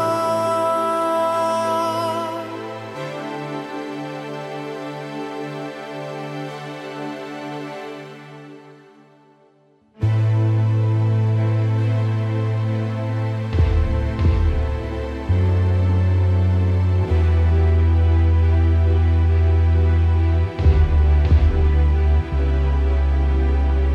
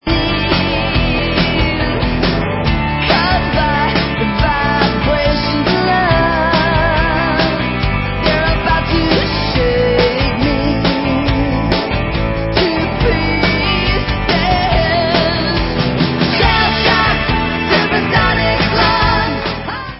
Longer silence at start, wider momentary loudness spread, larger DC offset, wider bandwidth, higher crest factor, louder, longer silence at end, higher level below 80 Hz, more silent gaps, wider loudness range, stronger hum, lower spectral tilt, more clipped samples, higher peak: about the same, 0 s vs 0.05 s; first, 13 LU vs 4 LU; neither; first, 11.5 kHz vs 5.8 kHz; about the same, 14 dB vs 14 dB; second, -20 LUFS vs -14 LUFS; about the same, 0 s vs 0 s; about the same, -22 dBFS vs -22 dBFS; neither; first, 13 LU vs 2 LU; neither; about the same, -8 dB/octave vs -9 dB/octave; neither; second, -4 dBFS vs 0 dBFS